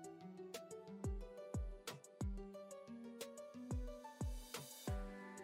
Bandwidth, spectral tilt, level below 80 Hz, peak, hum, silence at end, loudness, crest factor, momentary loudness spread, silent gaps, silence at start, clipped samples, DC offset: 16 kHz; -5.5 dB/octave; -52 dBFS; -32 dBFS; none; 0 s; -50 LUFS; 16 dB; 7 LU; none; 0 s; under 0.1%; under 0.1%